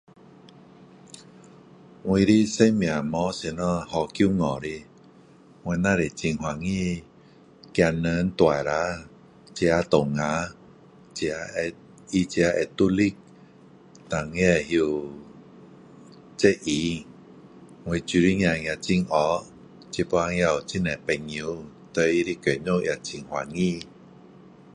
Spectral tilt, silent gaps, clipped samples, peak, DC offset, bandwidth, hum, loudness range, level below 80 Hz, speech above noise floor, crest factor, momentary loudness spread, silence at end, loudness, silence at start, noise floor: -5.5 dB/octave; none; under 0.1%; -4 dBFS; under 0.1%; 10.5 kHz; none; 3 LU; -48 dBFS; 29 dB; 22 dB; 14 LU; 0.85 s; -25 LUFS; 1.15 s; -52 dBFS